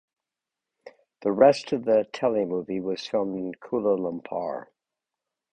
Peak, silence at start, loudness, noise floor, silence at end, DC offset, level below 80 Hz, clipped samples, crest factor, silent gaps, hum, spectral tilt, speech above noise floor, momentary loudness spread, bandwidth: -6 dBFS; 0.85 s; -25 LUFS; -88 dBFS; 0.9 s; under 0.1%; -68 dBFS; under 0.1%; 22 dB; none; none; -6 dB/octave; 63 dB; 12 LU; 9 kHz